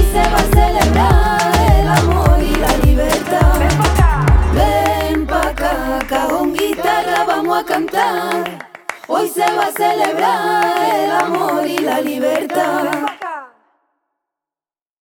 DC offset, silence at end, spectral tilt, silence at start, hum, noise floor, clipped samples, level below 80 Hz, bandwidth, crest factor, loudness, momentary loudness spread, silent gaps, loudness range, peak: under 0.1%; 1.55 s; -5.5 dB/octave; 0 s; none; under -90 dBFS; under 0.1%; -20 dBFS; 19.5 kHz; 14 dB; -15 LUFS; 7 LU; none; 4 LU; 0 dBFS